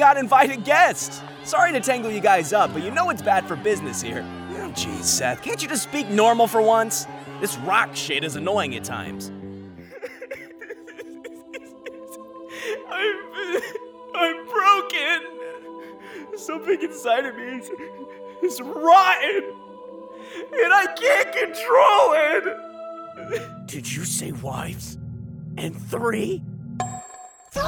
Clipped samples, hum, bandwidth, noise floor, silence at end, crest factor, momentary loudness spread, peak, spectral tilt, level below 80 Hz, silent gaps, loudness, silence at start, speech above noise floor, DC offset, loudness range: under 0.1%; none; over 20 kHz; -43 dBFS; 0 s; 18 dB; 22 LU; -4 dBFS; -3 dB/octave; -60 dBFS; none; -21 LUFS; 0 s; 22 dB; under 0.1%; 11 LU